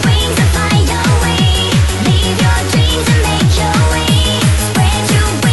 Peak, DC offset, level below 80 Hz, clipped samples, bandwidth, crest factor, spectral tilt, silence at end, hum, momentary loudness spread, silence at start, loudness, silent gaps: 0 dBFS; 2%; -18 dBFS; under 0.1%; 12.5 kHz; 10 dB; -4.5 dB/octave; 0 s; none; 1 LU; 0 s; -12 LUFS; none